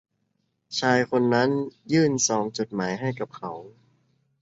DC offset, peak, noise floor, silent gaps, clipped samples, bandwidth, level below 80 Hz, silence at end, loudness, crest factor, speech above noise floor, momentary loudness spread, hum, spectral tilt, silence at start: under 0.1%; -6 dBFS; -74 dBFS; none; under 0.1%; 8 kHz; -66 dBFS; 0.7 s; -24 LUFS; 20 dB; 49 dB; 12 LU; none; -4.5 dB/octave; 0.7 s